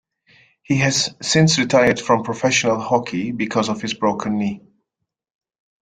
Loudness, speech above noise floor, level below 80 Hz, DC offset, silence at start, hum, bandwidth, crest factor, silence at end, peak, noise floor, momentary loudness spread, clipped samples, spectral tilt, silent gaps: -18 LUFS; 62 dB; -54 dBFS; under 0.1%; 0.7 s; none; 9.6 kHz; 18 dB; 1.25 s; -2 dBFS; -80 dBFS; 9 LU; under 0.1%; -4 dB/octave; none